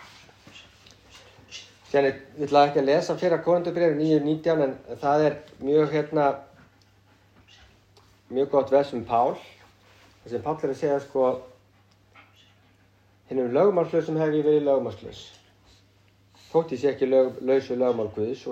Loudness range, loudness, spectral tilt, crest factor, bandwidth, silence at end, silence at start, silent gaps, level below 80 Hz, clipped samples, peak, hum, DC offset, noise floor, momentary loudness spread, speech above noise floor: 6 LU; -24 LUFS; -7 dB/octave; 20 dB; 8.6 kHz; 0 s; 0 s; none; -64 dBFS; under 0.1%; -6 dBFS; none; under 0.1%; -60 dBFS; 12 LU; 37 dB